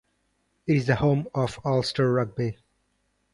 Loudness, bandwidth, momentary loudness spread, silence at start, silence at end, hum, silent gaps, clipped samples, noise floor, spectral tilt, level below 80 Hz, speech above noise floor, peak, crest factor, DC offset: -25 LUFS; 11.5 kHz; 8 LU; 0.65 s; 0.8 s; none; none; under 0.1%; -72 dBFS; -7 dB/octave; -54 dBFS; 48 dB; -8 dBFS; 18 dB; under 0.1%